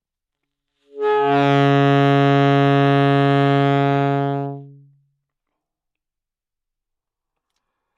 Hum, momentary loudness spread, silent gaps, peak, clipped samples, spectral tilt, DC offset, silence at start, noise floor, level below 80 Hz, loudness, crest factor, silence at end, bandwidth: none; 9 LU; none; -6 dBFS; under 0.1%; -8.5 dB/octave; under 0.1%; 0.95 s; -85 dBFS; -64 dBFS; -16 LUFS; 14 dB; 3.3 s; 7 kHz